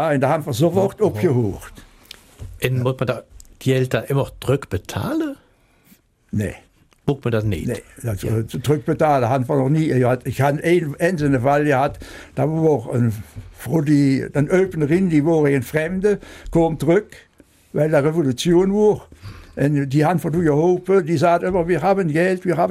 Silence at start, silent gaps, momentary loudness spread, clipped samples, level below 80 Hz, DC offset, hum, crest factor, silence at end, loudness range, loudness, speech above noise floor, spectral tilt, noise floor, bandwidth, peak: 0 s; none; 11 LU; under 0.1%; -44 dBFS; under 0.1%; none; 16 dB; 0 s; 6 LU; -19 LUFS; 37 dB; -7 dB/octave; -56 dBFS; 16 kHz; -2 dBFS